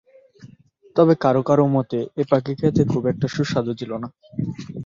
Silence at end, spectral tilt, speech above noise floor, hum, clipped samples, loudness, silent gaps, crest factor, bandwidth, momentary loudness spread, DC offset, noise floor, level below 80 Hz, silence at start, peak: 0 s; -8 dB/octave; 31 dB; none; under 0.1%; -21 LUFS; none; 18 dB; 7.6 kHz; 12 LU; under 0.1%; -51 dBFS; -52 dBFS; 0.4 s; -4 dBFS